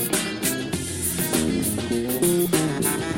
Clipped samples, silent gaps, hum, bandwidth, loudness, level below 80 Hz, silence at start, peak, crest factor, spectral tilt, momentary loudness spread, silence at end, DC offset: under 0.1%; none; none; 17 kHz; -23 LUFS; -48 dBFS; 0 s; -6 dBFS; 18 dB; -4 dB/octave; 5 LU; 0 s; under 0.1%